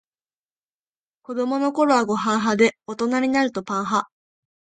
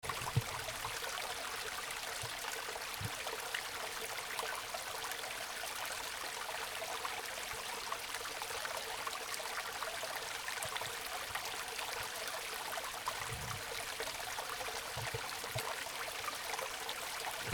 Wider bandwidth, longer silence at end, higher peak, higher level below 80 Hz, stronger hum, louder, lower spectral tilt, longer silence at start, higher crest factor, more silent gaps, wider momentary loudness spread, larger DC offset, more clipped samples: second, 9.4 kHz vs over 20 kHz; first, 0.65 s vs 0 s; first, -4 dBFS vs -18 dBFS; about the same, -64 dBFS vs -64 dBFS; neither; first, -21 LUFS vs -40 LUFS; first, -4.5 dB/octave vs -1.5 dB/octave; first, 1.3 s vs 0 s; second, 18 dB vs 24 dB; neither; first, 8 LU vs 1 LU; neither; neither